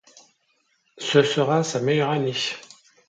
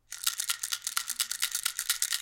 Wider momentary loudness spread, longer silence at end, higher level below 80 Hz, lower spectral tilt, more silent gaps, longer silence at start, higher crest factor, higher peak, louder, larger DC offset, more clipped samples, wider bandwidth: first, 10 LU vs 2 LU; first, 0.5 s vs 0 s; about the same, -70 dBFS vs -70 dBFS; first, -4.5 dB/octave vs 5 dB/octave; neither; first, 0.95 s vs 0.1 s; about the same, 20 dB vs 24 dB; first, -4 dBFS vs -8 dBFS; first, -22 LUFS vs -30 LUFS; neither; neither; second, 9.2 kHz vs 17 kHz